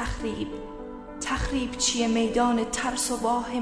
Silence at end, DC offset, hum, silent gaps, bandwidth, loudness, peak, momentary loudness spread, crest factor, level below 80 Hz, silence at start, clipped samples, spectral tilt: 0 s; under 0.1%; none; none; 11 kHz; -26 LUFS; -10 dBFS; 14 LU; 16 dB; -40 dBFS; 0 s; under 0.1%; -3 dB/octave